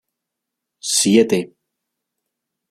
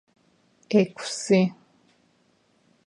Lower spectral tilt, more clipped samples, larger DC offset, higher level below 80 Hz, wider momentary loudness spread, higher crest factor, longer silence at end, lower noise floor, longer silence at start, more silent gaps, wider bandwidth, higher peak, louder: second, -3.5 dB/octave vs -5.5 dB/octave; neither; neither; first, -64 dBFS vs -72 dBFS; first, 16 LU vs 6 LU; about the same, 20 dB vs 20 dB; about the same, 1.25 s vs 1.35 s; first, -81 dBFS vs -65 dBFS; first, 0.85 s vs 0.7 s; neither; first, 16 kHz vs 11 kHz; first, -2 dBFS vs -8 dBFS; first, -16 LUFS vs -24 LUFS